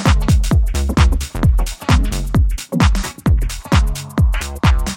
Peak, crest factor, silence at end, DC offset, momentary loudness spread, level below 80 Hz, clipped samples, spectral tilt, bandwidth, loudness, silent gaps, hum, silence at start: 0 dBFS; 14 dB; 0 s; under 0.1%; 4 LU; -16 dBFS; under 0.1%; -5.5 dB/octave; 17 kHz; -17 LUFS; none; none; 0 s